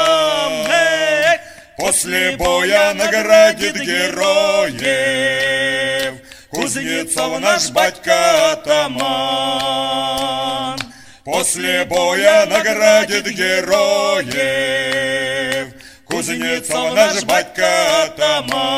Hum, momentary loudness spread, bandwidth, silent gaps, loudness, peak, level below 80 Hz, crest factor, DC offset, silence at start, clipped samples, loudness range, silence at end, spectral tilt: none; 9 LU; 16 kHz; none; -15 LUFS; 0 dBFS; -48 dBFS; 16 dB; under 0.1%; 0 s; under 0.1%; 4 LU; 0 s; -2 dB/octave